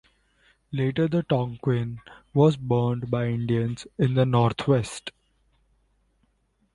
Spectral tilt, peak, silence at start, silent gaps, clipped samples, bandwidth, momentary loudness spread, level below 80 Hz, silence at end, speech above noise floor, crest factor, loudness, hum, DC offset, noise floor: -7.5 dB/octave; -8 dBFS; 0.7 s; none; under 0.1%; 11.5 kHz; 13 LU; -54 dBFS; 1.65 s; 45 dB; 18 dB; -25 LUFS; none; under 0.1%; -69 dBFS